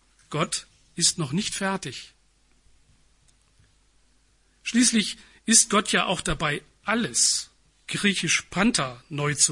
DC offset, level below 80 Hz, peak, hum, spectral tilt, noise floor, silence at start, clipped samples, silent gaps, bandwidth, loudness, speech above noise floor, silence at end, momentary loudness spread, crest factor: under 0.1%; -50 dBFS; -4 dBFS; none; -2.5 dB/octave; -63 dBFS; 0.3 s; under 0.1%; none; 11.5 kHz; -23 LUFS; 39 dB; 0 s; 14 LU; 24 dB